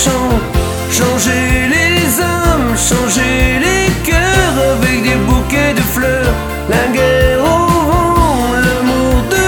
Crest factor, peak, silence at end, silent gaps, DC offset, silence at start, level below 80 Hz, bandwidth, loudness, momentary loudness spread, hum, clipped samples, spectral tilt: 12 dB; 0 dBFS; 0 s; none; under 0.1%; 0 s; -20 dBFS; over 20 kHz; -12 LUFS; 4 LU; none; under 0.1%; -4.5 dB/octave